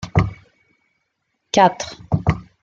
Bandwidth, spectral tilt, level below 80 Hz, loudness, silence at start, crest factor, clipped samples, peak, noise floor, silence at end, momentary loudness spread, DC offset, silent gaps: 7.6 kHz; -5.5 dB/octave; -38 dBFS; -19 LUFS; 0 s; 20 dB; under 0.1%; -2 dBFS; -72 dBFS; 0.2 s; 10 LU; under 0.1%; none